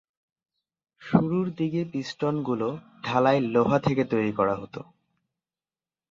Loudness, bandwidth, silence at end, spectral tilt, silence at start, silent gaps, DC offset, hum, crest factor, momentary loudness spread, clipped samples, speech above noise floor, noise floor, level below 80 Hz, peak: -26 LUFS; 7.6 kHz; 1.3 s; -7.5 dB/octave; 1 s; none; under 0.1%; none; 22 dB; 10 LU; under 0.1%; over 65 dB; under -90 dBFS; -60 dBFS; -6 dBFS